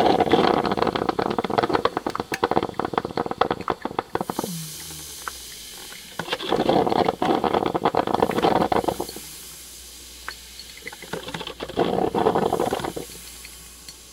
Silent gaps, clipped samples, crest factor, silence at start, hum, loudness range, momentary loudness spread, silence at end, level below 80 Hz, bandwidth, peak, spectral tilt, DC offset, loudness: none; under 0.1%; 24 dB; 0 s; none; 7 LU; 17 LU; 0 s; -50 dBFS; 17.5 kHz; -2 dBFS; -4.5 dB/octave; under 0.1%; -24 LUFS